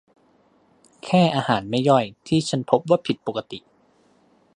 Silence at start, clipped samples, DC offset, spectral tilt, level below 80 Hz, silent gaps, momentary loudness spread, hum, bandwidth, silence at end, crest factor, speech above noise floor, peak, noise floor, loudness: 1.05 s; under 0.1%; under 0.1%; -6 dB/octave; -62 dBFS; none; 14 LU; none; 11 kHz; 0.95 s; 22 dB; 39 dB; -2 dBFS; -60 dBFS; -21 LUFS